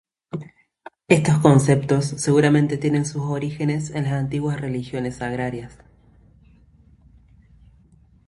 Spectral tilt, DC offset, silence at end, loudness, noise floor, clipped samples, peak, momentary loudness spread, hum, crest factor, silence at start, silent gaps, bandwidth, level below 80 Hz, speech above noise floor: -6.5 dB/octave; under 0.1%; 2.55 s; -21 LUFS; -54 dBFS; under 0.1%; 0 dBFS; 18 LU; none; 22 dB; 0.35 s; none; 11.5 kHz; -52 dBFS; 34 dB